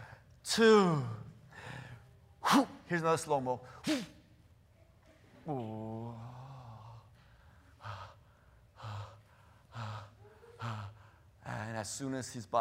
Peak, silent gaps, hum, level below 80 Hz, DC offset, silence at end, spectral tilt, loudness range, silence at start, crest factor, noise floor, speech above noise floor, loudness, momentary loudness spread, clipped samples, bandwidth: -14 dBFS; none; none; -68 dBFS; under 0.1%; 0 s; -5 dB/octave; 18 LU; 0 s; 22 dB; -63 dBFS; 32 dB; -34 LUFS; 23 LU; under 0.1%; 16 kHz